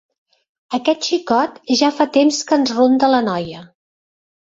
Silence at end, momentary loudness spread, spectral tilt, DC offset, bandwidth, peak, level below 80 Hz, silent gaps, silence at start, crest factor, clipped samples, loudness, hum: 0.95 s; 10 LU; -3.5 dB/octave; under 0.1%; 8 kHz; -2 dBFS; -60 dBFS; none; 0.7 s; 16 dB; under 0.1%; -16 LUFS; none